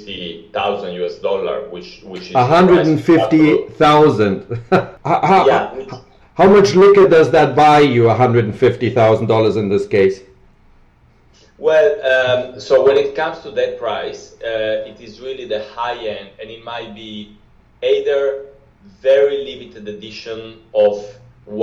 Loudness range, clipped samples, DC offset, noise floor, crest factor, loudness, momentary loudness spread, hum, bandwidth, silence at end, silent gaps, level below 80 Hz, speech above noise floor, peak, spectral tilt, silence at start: 12 LU; under 0.1%; under 0.1%; -50 dBFS; 12 dB; -14 LUFS; 21 LU; none; 9 kHz; 0 s; none; -48 dBFS; 36 dB; -4 dBFS; -6.5 dB/octave; 0 s